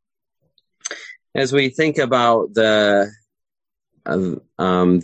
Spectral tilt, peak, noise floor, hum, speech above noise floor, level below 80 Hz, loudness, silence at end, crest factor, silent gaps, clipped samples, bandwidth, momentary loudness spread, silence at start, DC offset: -5 dB/octave; -2 dBFS; -90 dBFS; none; 73 dB; -54 dBFS; -18 LUFS; 0 s; 16 dB; none; under 0.1%; 9 kHz; 15 LU; 0.85 s; under 0.1%